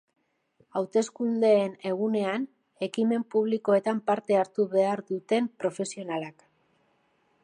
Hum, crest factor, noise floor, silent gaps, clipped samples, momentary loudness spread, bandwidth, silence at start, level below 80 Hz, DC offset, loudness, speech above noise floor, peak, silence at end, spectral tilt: none; 16 dB; -69 dBFS; none; under 0.1%; 10 LU; 10.5 kHz; 0.75 s; -82 dBFS; under 0.1%; -27 LUFS; 43 dB; -12 dBFS; 1.15 s; -5.5 dB/octave